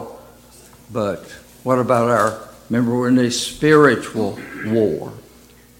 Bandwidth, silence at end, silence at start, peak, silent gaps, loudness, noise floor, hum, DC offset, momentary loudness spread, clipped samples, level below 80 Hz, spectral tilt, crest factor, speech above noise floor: 17 kHz; 0.6 s; 0 s; -2 dBFS; none; -18 LUFS; -47 dBFS; 60 Hz at -40 dBFS; under 0.1%; 16 LU; under 0.1%; -52 dBFS; -5.5 dB/octave; 18 dB; 30 dB